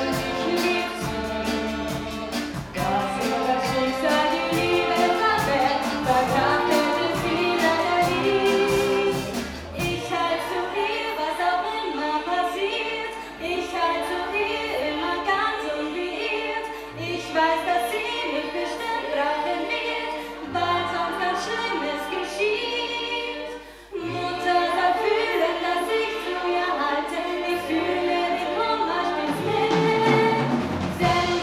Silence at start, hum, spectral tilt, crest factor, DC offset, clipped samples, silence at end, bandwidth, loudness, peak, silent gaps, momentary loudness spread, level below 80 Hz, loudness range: 0 s; none; -4.5 dB/octave; 18 dB; under 0.1%; under 0.1%; 0 s; 17.5 kHz; -24 LUFS; -6 dBFS; none; 8 LU; -48 dBFS; 4 LU